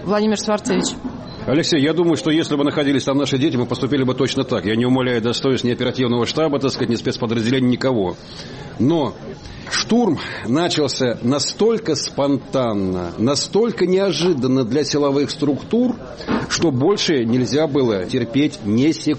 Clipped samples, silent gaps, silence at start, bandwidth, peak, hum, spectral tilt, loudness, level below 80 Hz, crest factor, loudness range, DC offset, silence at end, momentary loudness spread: under 0.1%; none; 0 s; 8.8 kHz; -6 dBFS; none; -5 dB/octave; -19 LUFS; -48 dBFS; 12 dB; 2 LU; under 0.1%; 0 s; 5 LU